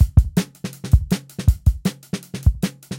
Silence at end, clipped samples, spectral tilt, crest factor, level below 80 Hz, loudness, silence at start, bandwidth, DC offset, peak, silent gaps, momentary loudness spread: 0 s; under 0.1%; -6.5 dB/octave; 18 dB; -22 dBFS; -21 LUFS; 0 s; 17 kHz; under 0.1%; 0 dBFS; none; 12 LU